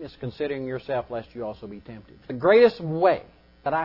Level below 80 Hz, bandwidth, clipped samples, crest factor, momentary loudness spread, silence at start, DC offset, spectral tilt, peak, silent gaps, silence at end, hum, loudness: -56 dBFS; 5.8 kHz; under 0.1%; 18 dB; 22 LU; 0 s; under 0.1%; -8.5 dB/octave; -6 dBFS; none; 0 s; none; -23 LUFS